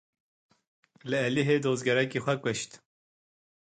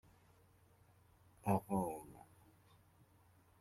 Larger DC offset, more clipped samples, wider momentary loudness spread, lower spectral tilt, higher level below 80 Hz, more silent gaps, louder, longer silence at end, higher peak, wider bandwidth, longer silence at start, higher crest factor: neither; neither; second, 10 LU vs 22 LU; second, -5 dB/octave vs -8 dB/octave; about the same, -70 dBFS vs -72 dBFS; neither; first, -28 LUFS vs -41 LUFS; second, 0.95 s vs 1.4 s; first, -12 dBFS vs -22 dBFS; second, 9.4 kHz vs 16 kHz; second, 1.05 s vs 1.45 s; second, 18 dB vs 26 dB